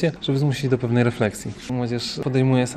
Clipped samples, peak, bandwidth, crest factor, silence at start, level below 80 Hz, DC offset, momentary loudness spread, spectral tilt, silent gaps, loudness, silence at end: under 0.1%; -4 dBFS; 13.5 kHz; 16 dB; 0 s; -50 dBFS; under 0.1%; 7 LU; -6.5 dB/octave; none; -22 LUFS; 0 s